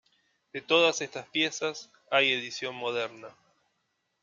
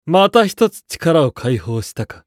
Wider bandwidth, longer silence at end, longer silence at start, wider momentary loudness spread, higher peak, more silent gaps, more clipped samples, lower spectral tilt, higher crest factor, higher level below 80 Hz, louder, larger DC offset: second, 7.6 kHz vs 16.5 kHz; first, 0.9 s vs 0.15 s; first, 0.55 s vs 0.05 s; first, 18 LU vs 11 LU; second, -8 dBFS vs 0 dBFS; neither; neither; second, -2 dB/octave vs -5.5 dB/octave; first, 24 dB vs 16 dB; second, -82 dBFS vs -48 dBFS; second, -28 LUFS vs -16 LUFS; neither